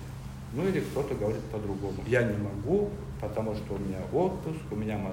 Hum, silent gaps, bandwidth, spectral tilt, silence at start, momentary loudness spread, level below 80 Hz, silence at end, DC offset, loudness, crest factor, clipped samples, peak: none; none; 16 kHz; -7.5 dB/octave; 0 s; 8 LU; -46 dBFS; 0 s; under 0.1%; -31 LUFS; 18 dB; under 0.1%; -12 dBFS